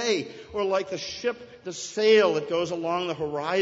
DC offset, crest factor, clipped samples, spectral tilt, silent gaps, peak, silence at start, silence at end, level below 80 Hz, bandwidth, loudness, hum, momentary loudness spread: under 0.1%; 18 dB; under 0.1%; -3.5 dB/octave; none; -8 dBFS; 0 s; 0 s; -64 dBFS; 8 kHz; -26 LUFS; none; 14 LU